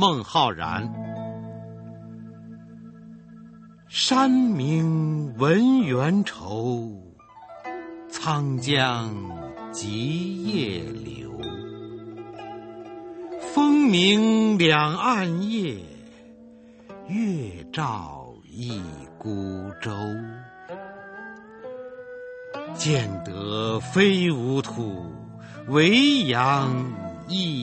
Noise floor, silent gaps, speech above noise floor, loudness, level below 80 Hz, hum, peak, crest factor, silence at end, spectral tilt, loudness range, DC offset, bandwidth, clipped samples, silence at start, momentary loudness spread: -48 dBFS; none; 25 dB; -23 LUFS; -58 dBFS; none; -2 dBFS; 22 dB; 0 s; -5.5 dB/octave; 13 LU; under 0.1%; 8.8 kHz; under 0.1%; 0 s; 21 LU